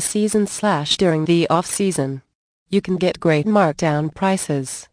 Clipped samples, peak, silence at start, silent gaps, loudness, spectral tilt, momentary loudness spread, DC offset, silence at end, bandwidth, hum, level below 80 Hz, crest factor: under 0.1%; -2 dBFS; 0 s; 2.35-2.66 s; -19 LUFS; -5 dB/octave; 7 LU; under 0.1%; 0.1 s; 10.5 kHz; none; -54 dBFS; 16 dB